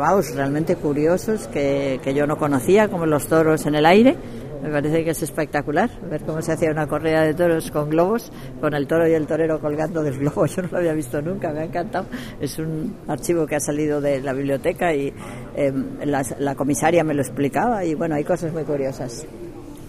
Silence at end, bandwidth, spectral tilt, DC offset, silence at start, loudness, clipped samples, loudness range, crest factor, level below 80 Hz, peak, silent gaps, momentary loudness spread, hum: 0 s; 15.5 kHz; -6 dB/octave; under 0.1%; 0 s; -21 LUFS; under 0.1%; 6 LU; 20 dB; -44 dBFS; 0 dBFS; none; 10 LU; none